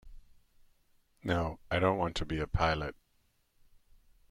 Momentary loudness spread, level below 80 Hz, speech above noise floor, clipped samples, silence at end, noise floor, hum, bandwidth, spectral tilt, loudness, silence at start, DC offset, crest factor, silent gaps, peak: 7 LU; -48 dBFS; 41 dB; under 0.1%; 1.4 s; -72 dBFS; none; 12.5 kHz; -6 dB/octave; -33 LUFS; 0.05 s; under 0.1%; 22 dB; none; -14 dBFS